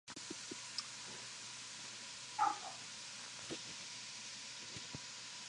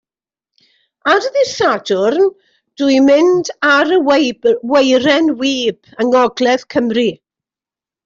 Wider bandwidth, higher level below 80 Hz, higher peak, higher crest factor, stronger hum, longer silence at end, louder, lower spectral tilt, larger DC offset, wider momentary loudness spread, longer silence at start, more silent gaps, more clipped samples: first, 11.5 kHz vs 7.8 kHz; second, -80 dBFS vs -58 dBFS; second, -24 dBFS vs -2 dBFS; first, 24 dB vs 12 dB; neither; second, 0 s vs 0.9 s; second, -45 LUFS vs -13 LUFS; second, -1 dB/octave vs -4 dB/octave; neither; first, 9 LU vs 6 LU; second, 0.05 s vs 1.05 s; neither; neither